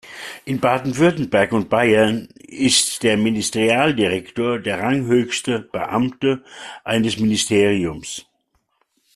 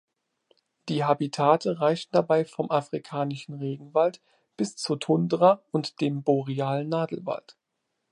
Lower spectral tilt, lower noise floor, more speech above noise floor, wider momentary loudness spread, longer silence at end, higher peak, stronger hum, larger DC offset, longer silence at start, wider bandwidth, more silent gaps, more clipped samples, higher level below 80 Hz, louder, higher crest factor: second, -4 dB/octave vs -6.5 dB/octave; second, -68 dBFS vs -80 dBFS; second, 49 dB vs 55 dB; about the same, 12 LU vs 12 LU; first, 0.95 s vs 0.6 s; first, -2 dBFS vs -6 dBFS; neither; neither; second, 0.05 s vs 0.85 s; first, 13.5 kHz vs 11.5 kHz; neither; neither; first, -54 dBFS vs -76 dBFS; first, -18 LUFS vs -26 LUFS; about the same, 18 dB vs 20 dB